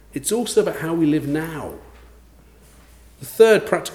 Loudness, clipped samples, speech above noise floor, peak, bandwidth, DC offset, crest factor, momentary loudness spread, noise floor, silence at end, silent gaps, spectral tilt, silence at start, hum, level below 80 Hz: -19 LUFS; under 0.1%; 30 dB; -2 dBFS; 18 kHz; under 0.1%; 20 dB; 20 LU; -49 dBFS; 0 s; none; -4.5 dB/octave; 0.15 s; none; -50 dBFS